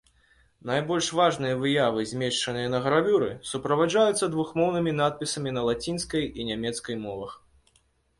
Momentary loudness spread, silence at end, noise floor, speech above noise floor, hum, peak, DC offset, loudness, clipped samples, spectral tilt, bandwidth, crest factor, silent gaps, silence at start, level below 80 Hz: 10 LU; 0.85 s; -67 dBFS; 41 dB; none; -10 dBFS; under 0.1%; -26 LUFS; under 0.1%; -4.5 dB/octave; 11.5 kHz; 18 dB; none; 0.65 s; -56 dBFS